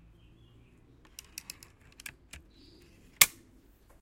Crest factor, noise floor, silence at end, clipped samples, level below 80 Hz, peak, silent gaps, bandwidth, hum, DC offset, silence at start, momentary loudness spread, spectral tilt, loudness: 36 dB; -60 dBFS; 0.75 s; under 0.1%; -62 dBFS; -2 dBFS; none; 16.5 kHz; none; under 0.1%; 3.2 s; 28 LU; 1 dB/octave; -24 LUFS